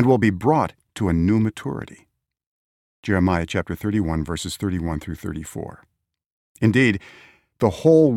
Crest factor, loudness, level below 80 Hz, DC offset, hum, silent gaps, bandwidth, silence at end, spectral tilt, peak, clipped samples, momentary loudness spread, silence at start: 18 dB; -22 LUFS; -42 dBFS; under 0.1%; none; 2.47-3.03 s, 6.26-6.55 s; 16 kHz; 0 s; -7 dB/octave; -4 dBFS; under 0.1%; 14 LU; 0 s